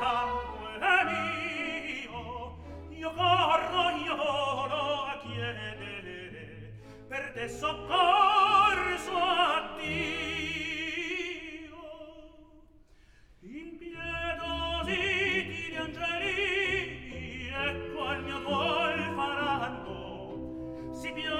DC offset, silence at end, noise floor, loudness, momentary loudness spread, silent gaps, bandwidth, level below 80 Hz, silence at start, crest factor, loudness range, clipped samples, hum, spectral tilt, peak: under 0.1%; 0 s; -58 dBFS; -30 LUFS; 18 LU; none; 16 kHz; -52 dBFS; 0 s; 20 dB; 10 LU; under 0.1%; none; -4 dB/octave; -12 dBFS